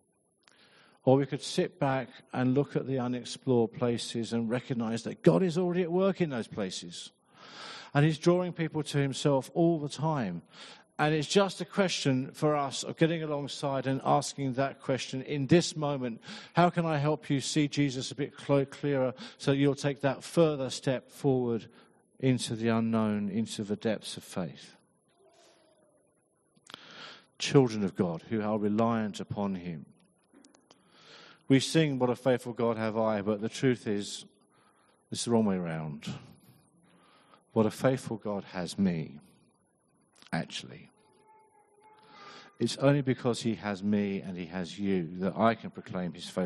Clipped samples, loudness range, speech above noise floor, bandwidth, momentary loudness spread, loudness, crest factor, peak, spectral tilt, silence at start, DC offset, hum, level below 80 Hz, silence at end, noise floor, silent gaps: under 0.1%; 6 LU; 41 dB; 11.5 kHz; 12 LU; -30 LUFS; 22 dB; -8 dBFS; -6 dB/octave; 1.05 s; under 0.1%; none; -70 dBFS; 0 s; -71 dBFS; none